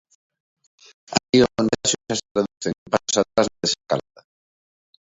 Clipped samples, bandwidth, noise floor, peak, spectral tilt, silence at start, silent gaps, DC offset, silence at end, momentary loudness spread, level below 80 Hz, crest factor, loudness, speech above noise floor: under 0.1%; 8 kHz; under -90 dBFS; 0 dBFS; -3.5 dB/octave; 1.1 s; 1.29-1.33 s, 2.31-2.35 s, 2.78-2.86 s; under 0.1%; 1.15 s; 9 LU; -54 dBFS; 24 dB; -22 LUFS; over 67 dB